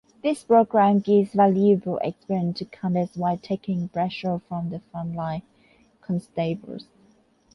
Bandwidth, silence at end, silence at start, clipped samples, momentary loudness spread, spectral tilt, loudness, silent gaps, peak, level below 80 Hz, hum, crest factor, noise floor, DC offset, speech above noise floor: 11.5 kHz; 0.75 s; 0.25 s; under 0.1%; 14 LU; -8 dB/octave; -24 LUFS; none; -6 dBFS; -62 dBFS; none; 18 dB; -60 dBFS; under 0.1%; 37 dB